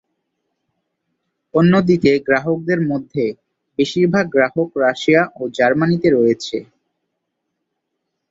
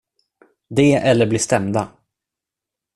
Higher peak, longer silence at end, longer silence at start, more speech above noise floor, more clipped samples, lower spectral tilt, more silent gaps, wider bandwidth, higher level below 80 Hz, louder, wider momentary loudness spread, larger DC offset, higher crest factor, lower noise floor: about the same, 0 dBFS vs -2 dBFS; first, 1.65 s vs 1.1 s; first, 1.55 s vs 0.7 s; second, 60 dB vs 69 dB; neither; first, -7 dB/octave vs -5.5 dB/octave; neither; second, 7.8 kHz vs 12.5 kHz; about the same, -56 dBFS vs -52 dBFS; about the same, -16 LUFS vs -17 LUFS; about the same, 9 LU vs 9 LU; neither; about the same, 18 dB vs 18 dB; second, -76 dBFS vs -86 dBFS